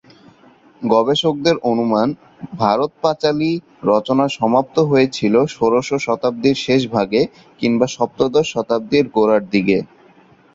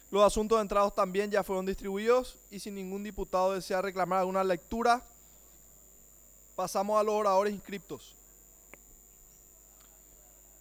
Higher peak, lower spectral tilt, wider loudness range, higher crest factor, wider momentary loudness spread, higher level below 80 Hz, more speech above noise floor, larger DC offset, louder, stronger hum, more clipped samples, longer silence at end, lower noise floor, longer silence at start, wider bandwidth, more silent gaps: first, -2 dBFS vs -12 dBFS; first, -6 dB/octave vs -4.5 dB/octave; about the same, 1 LU vs 3 LU; about the same, 16 dB vs 20 dB; second, 5 LU vs 15 LU; about the same, -54 dBFS vs -54 dBFS; first, 33 dB vs 27 dB; neither; first, -17 LUFS vs -30 LUFS; second, none vs 60 Hz at -65 dBFS; neither; second, 0.7 s vs 2.5 s; second, -49 dBFS vs -57 dBFS; first, 0.8 s vs 0.1 s; second, 7.8 kHz vs over 20 kHz; neither